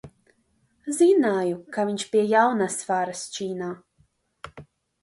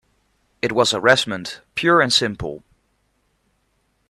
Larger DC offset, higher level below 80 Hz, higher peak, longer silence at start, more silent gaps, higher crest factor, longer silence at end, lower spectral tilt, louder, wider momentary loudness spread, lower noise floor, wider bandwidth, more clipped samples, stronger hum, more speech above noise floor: neither; second, -66 dBFS vs -52 dBFS; second, -8 dBFS vs 0 dBFS; second, 0.05 s vs 0.65 s; neither; about the same, 18 dB vs 22 dB; second, 0.4 s vs 1.5 s; first, -4.5 dB/octave vs -3 dB/octave; second, -23 LUFS vs -18 LUFS; first, 23 LU vs 15 LU; about the same, -67 dBFS vs -67 dBFS; second, 11.5 kHz vs 14 kHz; neither; neither; second, 44 dB vs 48 dB